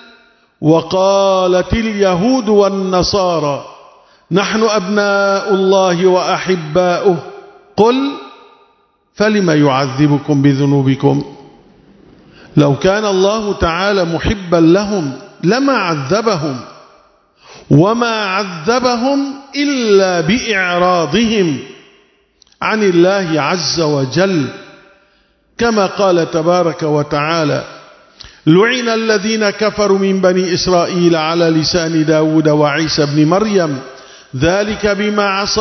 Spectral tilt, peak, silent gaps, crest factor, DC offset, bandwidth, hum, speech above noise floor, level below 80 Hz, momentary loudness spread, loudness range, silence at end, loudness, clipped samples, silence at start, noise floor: -5.5 dB/octave; 0 dBFS; none; 14 dB; under 0.1%; 6.4 kHz; none; 43 dB; -38 dBFS; 7 LU; 3 LU; 0 s; -13 LUFS; under 0.1%; 0.6 s; -55 dBFS